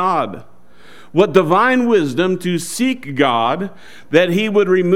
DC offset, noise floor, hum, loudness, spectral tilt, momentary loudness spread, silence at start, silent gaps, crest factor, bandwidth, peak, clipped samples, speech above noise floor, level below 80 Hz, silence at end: 2%; -45 dBFS; none; -16 LUFS; -5.5 dB/octave; 8 LU; 0 s; none; 16 dB; 16 kHz; 0 dBFS; under 0.1%; 30 dB; -58 dBFS; 0 s